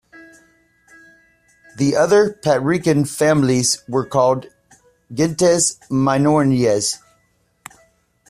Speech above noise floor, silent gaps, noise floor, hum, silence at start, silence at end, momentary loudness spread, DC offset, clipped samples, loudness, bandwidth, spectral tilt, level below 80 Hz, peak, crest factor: 46 dB; none; -62 dBFS; none; 1.75 s; 1.35 s; 7 LU; under 0.1%; under 0.1%; -17 LUFS; 15 kHz; -4.5 dB/octave; -54 dBFS; -4 dBFS; 16 dB